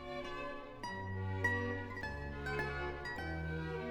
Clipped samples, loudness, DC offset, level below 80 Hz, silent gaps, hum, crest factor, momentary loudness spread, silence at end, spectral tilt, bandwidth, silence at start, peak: under 0.1%; -41 LUFS; under 0.1%; -52 dBFS; none; none; 20 dB; 9 LU; 0 s; -6.5 dB/octave; 15.5 kHz; 0 s; -20 dBFS